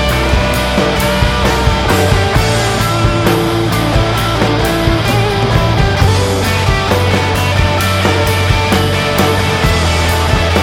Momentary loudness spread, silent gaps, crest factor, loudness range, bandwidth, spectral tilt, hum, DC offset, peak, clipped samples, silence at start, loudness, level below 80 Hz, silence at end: 1 LU; none; 12 dB; 0 LU; 17.5 kHz; -5 dB/octave; none; under 0.1%; 0 dBFS; under 0.1%; 0 s; -12 LUFS; -20 dBFS; 0 s